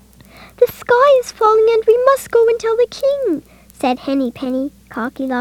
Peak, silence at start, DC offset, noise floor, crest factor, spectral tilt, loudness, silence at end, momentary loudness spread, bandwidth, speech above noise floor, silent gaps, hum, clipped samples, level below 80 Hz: 0 dBFS; 0.4 s; under 0.1%; -42 dBFS; 16 dB; -4 dB/octave; -15 LUFS; 0 s; 11 LU; 17 kHz; 27 dB; none; none; under 0.1%; -50 dBFS